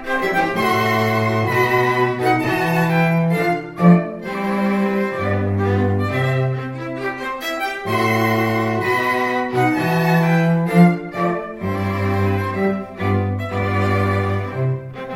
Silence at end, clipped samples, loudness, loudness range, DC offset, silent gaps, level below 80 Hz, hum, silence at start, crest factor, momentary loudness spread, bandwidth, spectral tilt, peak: 0 s; under 0.1%; -18 LUFS; 3 LU; under 0.1%; none; -50 dBFS; none; 0 s; 16 dB; 8 LU; 16.5 kHz; -7 dB/octave; -2 dBFS